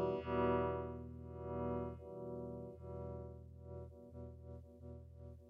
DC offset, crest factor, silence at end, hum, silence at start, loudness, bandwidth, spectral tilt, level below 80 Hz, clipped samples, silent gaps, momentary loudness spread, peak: under 0.1%; 20 dB; 0 s; none; 0 s; -44 LUFS; 5.4 kHz; -10 dB/octave; -58 dBFS; under 0.1%; none; 18 LU; -24 dBFS